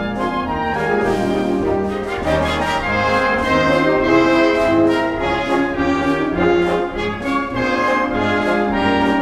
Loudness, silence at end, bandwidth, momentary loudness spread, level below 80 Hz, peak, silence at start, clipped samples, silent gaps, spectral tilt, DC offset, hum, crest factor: -17 LUFS; 0 s; 13 kHz; 6 LU; -36 dBFS; -2 dBFS; 0 s; under 0.1%; none; -6 dB/octave; under 0.1%; none; 14 dB